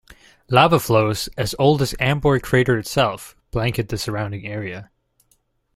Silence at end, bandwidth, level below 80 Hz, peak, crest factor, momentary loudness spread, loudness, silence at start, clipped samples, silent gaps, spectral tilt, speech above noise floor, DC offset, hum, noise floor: 0.9 s; 16 kHz; -42 dBFS; -2 dBFS; 18 dB; 13 LU; -20 LUFS; 0.5 s; under 0.1%; none; -5.5 dB/octave; 45 dB; under 0.1%; none; -64 dBFS